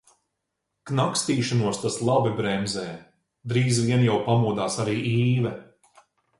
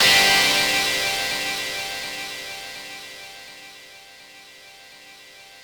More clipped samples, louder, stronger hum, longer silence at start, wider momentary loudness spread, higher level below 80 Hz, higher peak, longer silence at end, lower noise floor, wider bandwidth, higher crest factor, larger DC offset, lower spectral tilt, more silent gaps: neither; second, -24 LUFS vs -19 LUFS; neither; first, 0.85 s vs 0 s; second, 9 LU vs 26 LU; about the same, -58 dBFS vs -56 dBFS; about the same, -8 dBFS vs -6 dBFS; first, 0.75 s vs 0 s; first, -80 dBFS vs -46 dBFS; second, 11.5 kHz vs over 20 kHz; about the same, 16 dB vs 20 dB; neither; first, -5.5 dB/octave vs 0 dB/octave; neither